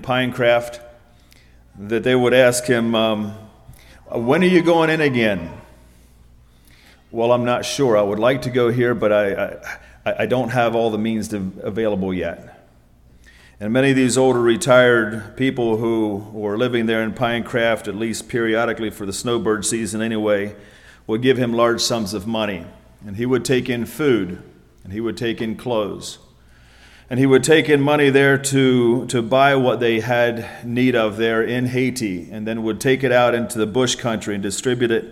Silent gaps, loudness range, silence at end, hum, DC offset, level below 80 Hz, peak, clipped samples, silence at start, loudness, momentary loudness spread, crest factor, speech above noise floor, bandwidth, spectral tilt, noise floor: none; 6 LU; 0 s; none; under 0.1%; -50 dBFS; -2 dBFS; under 0.1%; 0 s; -18 LUFS; 12 LU; 18 dB; 32 dB; 16 kHz; -5 dB/octave; -50 dBFS